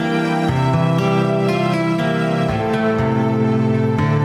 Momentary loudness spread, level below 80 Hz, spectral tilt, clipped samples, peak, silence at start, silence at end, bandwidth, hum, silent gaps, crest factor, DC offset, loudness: 2 LU; -42 dBFS; -7.5 dB/octave; under 0.1%; -6 dBFS; 0 s; 0 s; 12 kHz; none; none; 10 dB; under 0.1%; -17 LUFS